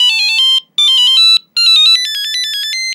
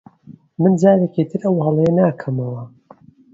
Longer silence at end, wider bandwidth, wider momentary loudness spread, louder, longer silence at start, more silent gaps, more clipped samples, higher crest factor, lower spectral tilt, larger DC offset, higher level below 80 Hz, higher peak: second, 0 s vs 0.65 s; first, 18.5 kHz vs 7.6 kHz; second, 9 LU vs 13 LU; first, -8 LUFS vs -17 LUFS; second, 0 s vs 0.3 s; neither; neither; second, 10 dB vs 18 dB; second, 6 dB/octave vs -9.5 dB/octave; neither; second, under -90 dBFS vs -58 dBFS; about the same, 0 dBFS vs 0 dBFS